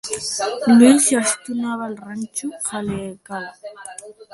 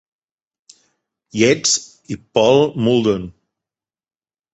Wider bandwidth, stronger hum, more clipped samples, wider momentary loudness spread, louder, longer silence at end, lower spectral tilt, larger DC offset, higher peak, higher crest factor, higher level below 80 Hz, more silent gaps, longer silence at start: first, 12 kHz vs 8.2 kHz; neither; neither; first, 23 LU vs 17 LU; about the same, -18 LUFS vs -16 LUFS; second, 0.1 s vs 1.25 s; about the same, -3.5 dB/octave vs -4 dB/octave; neither; about the same, 0 dBFS vs 0 dBFS; about the same, 18 dB vs 20 dB; about the same, -58 dBFS vs -54 dBFS; neither; second, 0.05 s vs 1.35 s